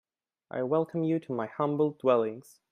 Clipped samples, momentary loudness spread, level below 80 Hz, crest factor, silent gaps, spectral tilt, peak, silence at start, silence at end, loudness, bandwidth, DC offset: under 0.1%; 9 LU; -78 dBFS; 20 dB; none; -8.5 dB/octave; -10 dBFS; 0.55 s; 0.3 s; -29 LUFS; 13.5 kHz; under 0.1%